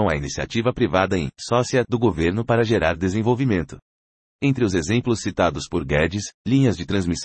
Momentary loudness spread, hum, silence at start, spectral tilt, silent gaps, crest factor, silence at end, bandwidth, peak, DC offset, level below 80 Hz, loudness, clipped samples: 6 LU; none; 0 s; -6 dB/octave; 3.82-4.39 s, 6.34-6.45 s; 16 dB; 0 s; 8.8 kHz; -4 dBFS; under 0.1%; -42 dBFS; -21 LUFS; under 0.1%